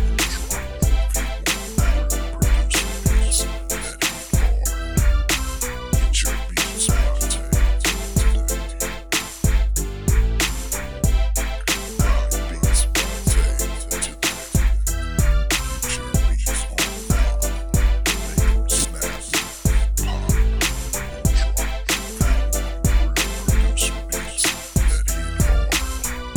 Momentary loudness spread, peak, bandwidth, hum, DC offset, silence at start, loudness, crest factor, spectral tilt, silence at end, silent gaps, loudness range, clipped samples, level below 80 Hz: 5 LU; -6 dBFS; over 20 kHz; none; 0.6%; 0 s; -21 LUFS; 14 dB; -3.5 dB/octave; 0 s; none; 1 LU; under 0.1%; -20 dBFS